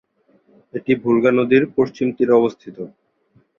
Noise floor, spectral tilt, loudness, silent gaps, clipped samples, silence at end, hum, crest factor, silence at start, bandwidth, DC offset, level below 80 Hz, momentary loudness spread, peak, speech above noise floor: -59 dBFS; -8 dB/octave; -17 LUFS; none; under 0.1%; 0.7 s; none; 18 dB; 0.75 s; 6.8 kHz; under 0.1%; -60 dBFS; 18 LU; -2 dBFS; 42 dB